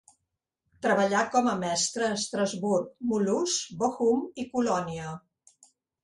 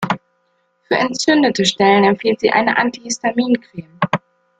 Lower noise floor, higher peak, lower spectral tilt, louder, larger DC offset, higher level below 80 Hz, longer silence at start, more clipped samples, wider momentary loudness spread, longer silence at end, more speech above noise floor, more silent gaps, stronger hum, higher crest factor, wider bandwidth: first, -84 dBFS vs -64 dBFS; second, -10 dBFS vs 0 dBFS; about the same, -3.5 dB/octave vs -4 dB/octave; second, -27 LUFS vs -16 LUFS; neither; second, -66 dBFS vs -58 dBFS; first, 0.8 s vs 0 s; neither; second, 8 LU vs 11 LU; first, 0.85 s vs 0.4 s; first, 56 dB vs 48 dB; neither; neither; about the same, 18 dB vs 16 dB; first, 11.5 kHz vs 9.6 kHz